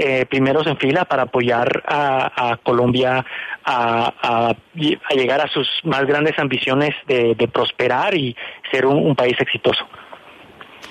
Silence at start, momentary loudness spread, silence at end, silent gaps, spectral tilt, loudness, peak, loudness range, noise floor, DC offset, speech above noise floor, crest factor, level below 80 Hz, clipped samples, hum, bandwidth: 0 s; 5 LU; 0 s; none; -6.5 dB/octave; -18 LUFS; -4 dBFS; 1 LU; -42 dBFS; under 0.1%; 24 dB; 14 dB; -56 dBFS; under 0.1%; none; 10.5 kHz